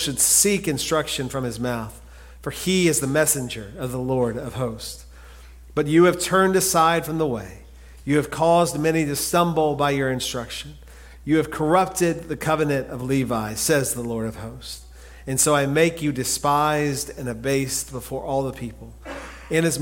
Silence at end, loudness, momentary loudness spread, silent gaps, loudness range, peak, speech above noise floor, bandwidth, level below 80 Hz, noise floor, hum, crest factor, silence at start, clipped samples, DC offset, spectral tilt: 0 s; -21 LUFS; 17 LU; none; 3 LU; -4 dBFS; 21 dB; 17 kHz; -44 dBFS; -43 dBFS; none; 18 dB; 0 s; under 0.1%; under 0.1%; -4 dB/octave